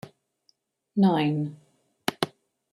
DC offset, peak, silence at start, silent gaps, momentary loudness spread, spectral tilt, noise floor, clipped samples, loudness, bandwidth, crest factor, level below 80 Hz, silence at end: under 0.1%; -6 dBFS; 0.05 s; none; 11 LU; -6.5 dB/octave; -69 dBFS; under 0.1%; -27 LUFS; 15 kHz; 22 dB; -70 dBFS; 0.45 s